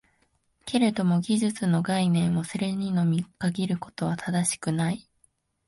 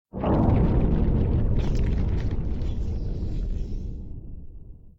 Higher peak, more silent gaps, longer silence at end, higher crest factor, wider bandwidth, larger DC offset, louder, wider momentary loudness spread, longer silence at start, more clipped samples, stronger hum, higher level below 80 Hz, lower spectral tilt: about the same, -8 dBFS vs -10 dBFS; neither; first, 0.65 s vs 0.1 s; about the same, 18 dB vs 14 dB; first, 11.5 kHz vs 7.2 kHz; neither; about the same, -26 LUFS vs -26 LUFS; second, 6 LU vs 18 LU; first, 0.65 s vs 0.15 s; neither; neither; second, -62 dBFS vs -26 dBFS; second, -5.5 dB/octave vs -9.5 dB/octave